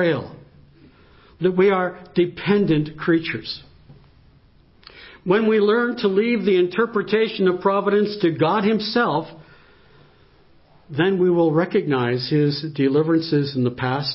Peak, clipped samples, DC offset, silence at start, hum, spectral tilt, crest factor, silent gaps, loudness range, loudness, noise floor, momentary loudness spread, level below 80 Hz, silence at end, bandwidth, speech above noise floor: -6 dBFS; under 0.1%; under 0.1%; 0 s; none; -11 dB/octave; 16 dB; none; 4 LU; -20 LUFS; -53 dBFS; 6 LU; -58 dBFS; 0 s; 5.8 kHz; 34 dB